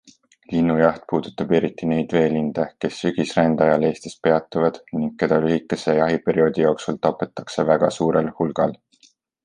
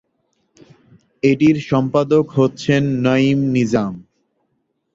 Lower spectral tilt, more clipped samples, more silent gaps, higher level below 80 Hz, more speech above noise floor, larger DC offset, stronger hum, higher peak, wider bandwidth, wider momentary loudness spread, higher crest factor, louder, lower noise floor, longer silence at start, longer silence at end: about the same, -6.5 dB/octave vs -7 dB/octave; neither; neither; about the same, -54 dBFS vs -52 dBFS; second, 38 dB vs 54 dB; neither; neither; about the same, -2 dBFS vs -2 dBFS; first, 10 kHz vs 7.8 kHz; about the same, 7 LU vs 5 LU; about the same, 18 dB vs 16 dB; second, -21 LUFS vs -16 LUFS; second, -58 dBFS vs -69 dBFS; second, 0.5 s vs 1.25 s; second, 0.7 s vs 0.95 s